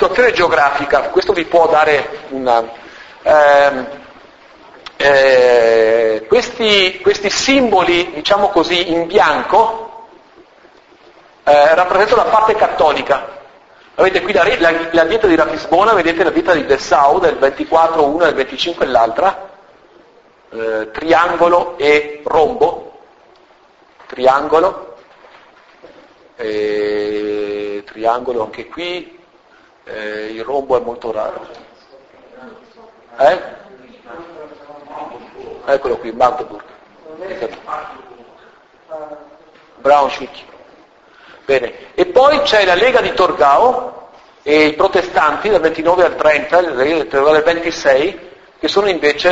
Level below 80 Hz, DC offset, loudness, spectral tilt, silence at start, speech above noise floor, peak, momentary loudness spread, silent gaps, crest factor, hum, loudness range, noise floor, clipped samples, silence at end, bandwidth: -46 dBFS; under 0.1%; -13 LUFS; -3.5 dB/octave; 0 s; 35 dB; 0 dBFS; 18 LU; none; 14 dB; none; 10 LU; -48 dBFS; under 0.1%; 0 s; 8 kHz